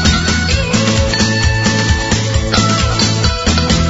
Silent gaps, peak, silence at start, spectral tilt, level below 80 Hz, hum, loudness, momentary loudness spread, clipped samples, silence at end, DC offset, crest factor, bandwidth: none; 0 dBFS; 0 s; -4 dB/octave; -20 dBFS; none; -13 LUFS; 2 LU; under 0.1%; 0 s; 0.5%; 12 dB; 8 kHz